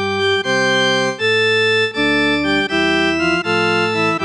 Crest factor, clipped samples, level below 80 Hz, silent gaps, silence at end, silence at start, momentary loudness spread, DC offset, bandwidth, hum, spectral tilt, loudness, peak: 10 dB; under 0.1%; -46 dBFS; none; 0 s; 0 s; 2 LU; under 0.1%; 11 kHz; none; -4 dB/octave; -15 LUFS; -6 dBFS